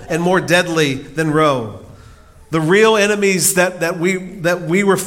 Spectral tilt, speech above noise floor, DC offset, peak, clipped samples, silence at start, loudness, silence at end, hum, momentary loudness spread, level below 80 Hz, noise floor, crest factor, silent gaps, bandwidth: -4 dB/octave; 27 dB; under 0.1%; 0 dBFS; under 0.1%; 0 s; -15 LUFS; 0 s; none; 8 LU; -48 dBFS; -42 dBFS; 16 dB; none; 17 kHz